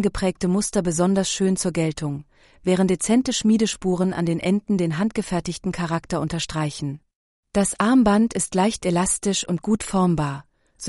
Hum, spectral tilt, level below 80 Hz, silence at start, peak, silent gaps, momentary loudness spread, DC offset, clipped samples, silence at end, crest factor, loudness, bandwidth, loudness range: none; -5 dB/octave; -46 dBFS; 0 s; -6 dBFS; 7.16-7.43 s; 8 LU; under 0.1%; under 0.1%; 0 s; 16 dB; -22 LUFS; 11.5 kHz; 4 LU